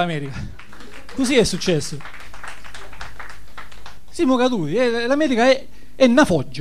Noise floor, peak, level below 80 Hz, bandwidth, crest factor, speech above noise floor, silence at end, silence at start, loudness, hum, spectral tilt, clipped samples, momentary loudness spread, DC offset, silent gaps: -40 dBFS; 0 dBFS; -44 dBFS; 14.5 kHz; 20 dB; 22 dB; 0 s; 0 s; -18 LUFS; 50 Hz at -50 dBFS; -5 dB/octave; under 0.1%; 23 LU; 4%; none